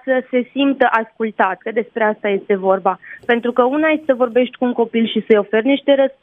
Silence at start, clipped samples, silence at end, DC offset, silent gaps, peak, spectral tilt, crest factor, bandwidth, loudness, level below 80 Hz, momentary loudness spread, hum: 0.05 s; under 0.1%; 0.1 s; under 0.1%; none; 0 dBFS; -7.5 dB/octave; 16 dB; 4 kHz; -17 LUFS; -66 dBFS; 6 LU; none